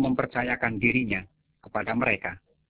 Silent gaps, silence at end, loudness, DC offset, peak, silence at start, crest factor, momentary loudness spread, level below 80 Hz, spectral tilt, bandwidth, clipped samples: none; 0.3 s; -27 LUFS; under 0.1%; -8 dBFS; 0 s; 20 dB; 9 LU; -54 dBFS; -5 dB/octave; 4 kHz; under 0.1%